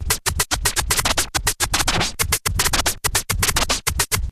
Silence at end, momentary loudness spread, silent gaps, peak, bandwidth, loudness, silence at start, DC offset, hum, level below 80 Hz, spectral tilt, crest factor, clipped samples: 0 s; 2 LU; none; -4 dBFS; 16 kHz; -19 LUFS; 0 s; under 0.1%; none; -30 dBFS; -1.5 dB/octave; 18 dB; under 0.1%